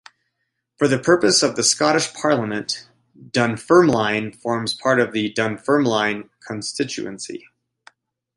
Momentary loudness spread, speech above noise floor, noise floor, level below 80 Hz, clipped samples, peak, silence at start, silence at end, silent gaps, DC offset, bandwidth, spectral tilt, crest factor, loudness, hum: 14 LU; 56 dB; -76 dBFS; -60 dBFS; under 0.1%; -2 dBFS; 0.8 s; 1 s; none; under 0.1%; 11.5 kHz; -3.5 dB/octave; 18 dB; -19 LUFS; none